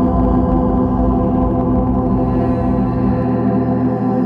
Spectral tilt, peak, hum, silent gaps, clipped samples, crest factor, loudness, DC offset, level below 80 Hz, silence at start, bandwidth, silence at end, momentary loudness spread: -11.5 dB/octave; -4 dBFS; none; none; under 0.1%; 10 dB; -16 LUFS; under 0.1%; -24 dBFS; 0 s; 4.4 kHz; 0 s; 2 LU